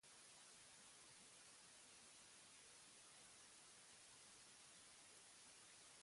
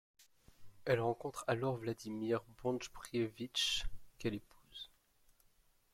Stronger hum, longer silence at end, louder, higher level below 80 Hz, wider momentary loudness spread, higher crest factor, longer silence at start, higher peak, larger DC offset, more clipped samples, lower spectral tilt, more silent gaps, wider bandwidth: neither; second, 0 s vs 1.05 s; second, -63 LUFS vs -39 LUFS; second, under -90 dBFS vs -58 dBFS; second, 0 LU vs 16 LU; second, 12 dB vs 22 dB; second, 0.05 s vs 0.6 s; second, -54 dBFS vs -18 dBFS; neither; neither; second, 0 dB/octave vs -4.5 dB/octave; neither; second, 11.5 kHz vs 16.5 kHz